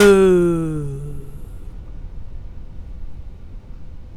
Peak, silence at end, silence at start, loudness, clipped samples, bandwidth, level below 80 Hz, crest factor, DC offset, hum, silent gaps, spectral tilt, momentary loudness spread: 0 dBFS; 0 s; 0 s; -17 LUFS; under 0.1%; 15.5 kHz; -34 dBFS; 20 dB; under 0.1%; none; none; -6.5 dB/octave; 26 LU